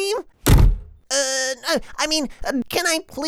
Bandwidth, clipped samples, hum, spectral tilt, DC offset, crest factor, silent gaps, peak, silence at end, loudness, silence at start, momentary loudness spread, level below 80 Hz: 16.5 kHz; under 0.1%; none; -4 dB/octave; under 0.1%; 16 dB; none; -4 dBFS; 0 s; -21 LUFS; 0 s; 8 LU; -24 dBFS